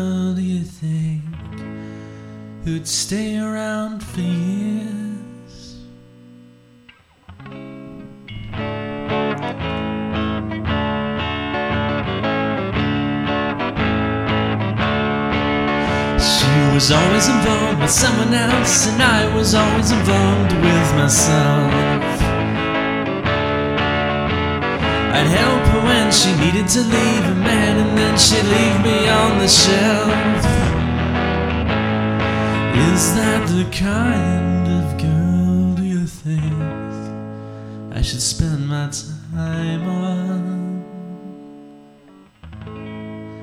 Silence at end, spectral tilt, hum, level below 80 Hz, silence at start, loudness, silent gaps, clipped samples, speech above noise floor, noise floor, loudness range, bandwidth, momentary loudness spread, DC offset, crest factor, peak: 0 s; -4.5 dB/octave; none; -32 dBFS; 0 s; -17 LUFS; none; under 0.1%; 34 dB; -49 dBFS; 12 LU; 16.5 kHz; 18 LU; under 0.1%; 18 dB; 0 dBFS